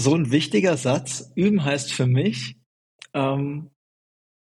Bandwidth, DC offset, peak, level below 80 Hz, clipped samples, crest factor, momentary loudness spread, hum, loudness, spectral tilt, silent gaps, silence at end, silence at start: 12 kHz; under 0.1%; -6 dBFS; -62 dBFS; under 0.1%; 18 dB; 11 LU; none; -22 LUFS; -5.5 dB/octave; 2.66-2.99 s; 0.8 s; 0 s